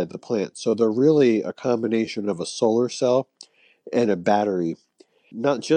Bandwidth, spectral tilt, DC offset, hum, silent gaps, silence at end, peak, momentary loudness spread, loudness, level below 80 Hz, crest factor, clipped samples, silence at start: 9.6 kHz; -6 dB/octave; under 0.1%; none; none; 0 s; -6 dBFS; 9 LU; -22 LUFS; -72 dBFS; 16 dB; under 0.1%; 0 s